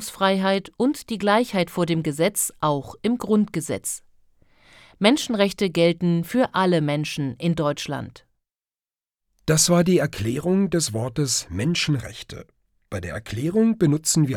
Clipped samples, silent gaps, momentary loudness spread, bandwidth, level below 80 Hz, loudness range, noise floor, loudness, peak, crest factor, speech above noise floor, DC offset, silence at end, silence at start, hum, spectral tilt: under 0.1%; none; 12 LU; 18.5 kHz; -54 dBFS; 3 LU; under -90 dBFS; -22 LUFS; -4 dBFS; 20 dB; over 68 dB; under 0.1%; 0 s; 0 s; none; -4.5 dB/octave